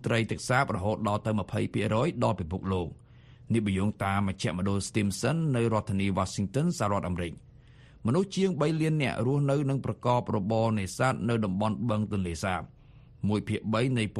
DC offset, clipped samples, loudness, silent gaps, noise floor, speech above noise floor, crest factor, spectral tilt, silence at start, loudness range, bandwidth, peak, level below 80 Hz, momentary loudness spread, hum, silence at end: under 0.1%; under 0.1%; -29 LUFS; none; -53 dBFS; 25 dB; 18 dB; -6.5 dB/octave; 0 s; 2 LU; 12.5 kHz; -12 dBFS; -54 dBFS; 5 LU; none; 0 s